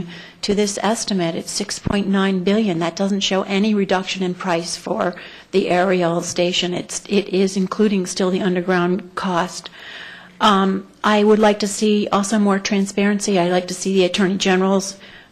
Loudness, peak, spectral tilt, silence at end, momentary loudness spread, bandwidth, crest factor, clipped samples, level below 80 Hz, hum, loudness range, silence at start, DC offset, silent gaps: -19 LUFS; -4 dBFS; -4.5 dB/octave; 0.1 s; 8 LU; 12.5 kHz; 14 dB; under 0.1%; -50 dBFS; none; 3 LU; 0 s; under 0.1%; none